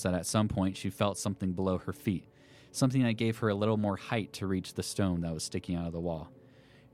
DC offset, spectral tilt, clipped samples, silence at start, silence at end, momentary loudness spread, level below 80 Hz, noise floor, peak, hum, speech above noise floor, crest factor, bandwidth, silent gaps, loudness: under 0.1%; -5.5 dB/octave; under 0.1%; 0 s; 0.6 s; 7 LU; -56 dBFS; -58 dBFS; -12 dBFS; none; 26 dB; 20 dB; 15.5 kHz; none; -32 LUFS